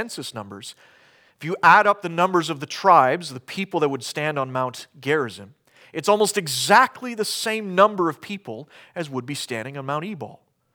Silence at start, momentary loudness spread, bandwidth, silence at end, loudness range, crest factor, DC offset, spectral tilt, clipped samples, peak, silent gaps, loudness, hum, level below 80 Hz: 0 s; 19 LU; over 20 kHz; 0.4 s; 5 LU; 20 dB; under 0.1%; -3.5 dB/octave; under 0.1%; -2 dBFS; none; -21 LUFS; none; -76 dBFS